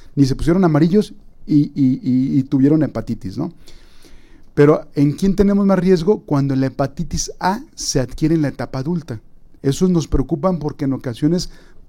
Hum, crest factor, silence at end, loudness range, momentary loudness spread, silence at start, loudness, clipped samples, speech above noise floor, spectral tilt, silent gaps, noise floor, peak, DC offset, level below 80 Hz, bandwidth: none; 16 dB; 0.05 s; 4 LU; 11 LU; 0.05 s; -18 LUFS; under 0.1%; 23 dB; -6.5 dB/octave; none; -39 dBFS; -2 dBFS; under 0.1%; -34 dBFS; 16 kHz